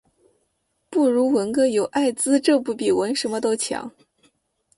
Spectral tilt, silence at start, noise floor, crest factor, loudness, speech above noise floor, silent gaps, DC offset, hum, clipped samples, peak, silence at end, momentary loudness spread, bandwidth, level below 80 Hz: -3.5 dB/octave; 0.9 s; -71 dBFS; 16 dB; -21 LUFS; 51 dB; none; under 0.1%; none; under 0.1%; -6 dBFS; 0.9 s; 8 LU; 11.5 kHz; -64 dBFS